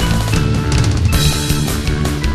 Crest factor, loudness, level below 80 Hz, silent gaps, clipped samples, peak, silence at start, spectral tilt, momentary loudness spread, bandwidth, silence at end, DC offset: 14 dB; -15 LUFS; -20 dBFS; none; under 0.1%; 0 dBFS; 0 s; -5 dB/octave; 4 LU; 14 kHz; 0 s; under 0.1%